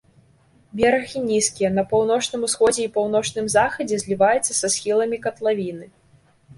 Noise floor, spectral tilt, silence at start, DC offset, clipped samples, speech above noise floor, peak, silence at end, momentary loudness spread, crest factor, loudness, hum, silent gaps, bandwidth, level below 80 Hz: -56 dBFS; -3 dB/octave; 0.75 s; under 0.1%; under 0.1%; 36 dB; -4 dBFS; 0.05 s; 6 LU; 16 dB; -21 LUFS; none; none; 11.5 kHz; -54 dBFS